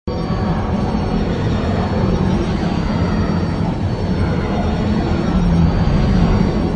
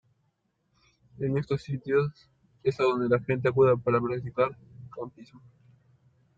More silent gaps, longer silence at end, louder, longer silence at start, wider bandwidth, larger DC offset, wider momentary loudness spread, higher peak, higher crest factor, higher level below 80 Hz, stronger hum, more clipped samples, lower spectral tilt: neither; second, 0 s vs 1 s; first, -18 LUFS vs -27 LUFS; second, 0.05 s vs 1.2 s; first, 9.2 kHz vs 7.6 kHz; first, 0.2% vs under 0.1%; second, 4 LU vs 18 LU; first, -2 dBFS vs -12 dBFS; about the same, 14 dB vs 18 dB; first, -24 dBFS vs -62 dBFS; neither; neither; about the same, -8 dB/octave vs -8.5 dB/octave